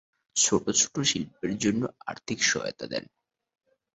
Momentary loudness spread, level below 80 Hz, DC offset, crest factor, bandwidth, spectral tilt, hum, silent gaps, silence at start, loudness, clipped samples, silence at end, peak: 12 LU; -62 dBFS; under 0.1%; 20 dB; 8.2 kHz; -2.5 dB/octave; none; none; 0.35 s; -26 LUFS; under 0.1%; 0.95 s; -8 dBFS